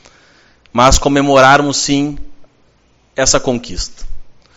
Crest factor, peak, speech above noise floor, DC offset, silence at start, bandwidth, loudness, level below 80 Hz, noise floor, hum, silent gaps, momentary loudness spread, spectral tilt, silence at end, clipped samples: 14 dB; 0 dBFS; 41 dB; under 0.1%; 0.75 s; 15 kHz; -12 LUFS; -26 dBFS; -53 dBFS; none; none; 16 LU; -3.5 dB/octave; 0.25 s; 0.3%